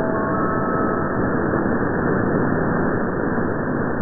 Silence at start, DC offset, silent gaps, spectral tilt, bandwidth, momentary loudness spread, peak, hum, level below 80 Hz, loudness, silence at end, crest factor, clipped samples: 0 s; under 0.1%; none; -14 dB/octave; 2.1 kHz; 2 LU; -6 dBFS; none; -38 dBFS; -21 LUFS; 0 s; 14 dB; under 0.1%